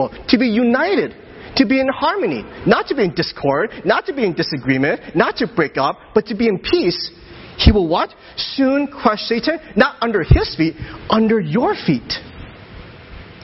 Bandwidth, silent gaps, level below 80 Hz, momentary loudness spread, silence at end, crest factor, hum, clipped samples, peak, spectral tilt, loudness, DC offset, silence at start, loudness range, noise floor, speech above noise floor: 6 kHz; none; -28 dBFS; 12 LU; 0 s; 18 dB; none; under 0.1%; 0 dBFS; -8 dB/octave; -17 LUFS; under 0.1%; 0 s; 1 LU; -37 dBFS; 20 dB